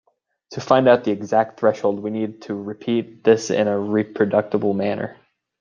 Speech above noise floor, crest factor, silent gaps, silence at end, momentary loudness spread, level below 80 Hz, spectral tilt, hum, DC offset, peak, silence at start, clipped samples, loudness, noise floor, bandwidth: 28 dB; 18 dB; none; 0.5 s; 12 LU; -66 dBFS; -6 dB/octave; none; under 0.1%; -2 dBFS; 0.5 s; under 0.1%; -20 LUFS; -48 dBFS; 7.4 kHz